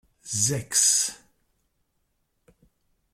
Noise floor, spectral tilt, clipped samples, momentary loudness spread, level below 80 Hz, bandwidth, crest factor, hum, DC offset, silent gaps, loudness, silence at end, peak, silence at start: -74 dBFS; -1.5 dB/octave; under 0.1%; 10 LU; -64 dBFS; 16.5 kHz; 22 dB; none; under 0.1%; none; -22 LUFS; 2 s; -8 dBFS; 0.25 s